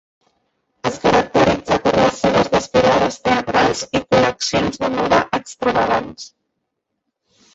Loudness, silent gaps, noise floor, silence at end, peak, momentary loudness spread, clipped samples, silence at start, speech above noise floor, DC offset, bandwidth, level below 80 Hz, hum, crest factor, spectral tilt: -17 LUFS; none; -76 dBFS; 1.3 s; -2 dBFS; 7 LU; under 0.1%; 0.85 s; 58 dB; under 0.1%; 8 kHz; -44 dBFS; none; 16 dB; -4.5 dB/octave